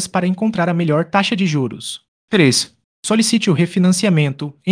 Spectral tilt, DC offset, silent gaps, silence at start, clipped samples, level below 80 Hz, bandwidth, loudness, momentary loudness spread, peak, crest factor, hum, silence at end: -5 dB/octave; under 0.1%; 2.08-2.28 s, 2.84-3.03 s; 0 s; under 0.1%; -60 dBFS; 10.5 kHz; -16 LUFS; 13 LU; 0 dBFS; 16 dB; none; 0 s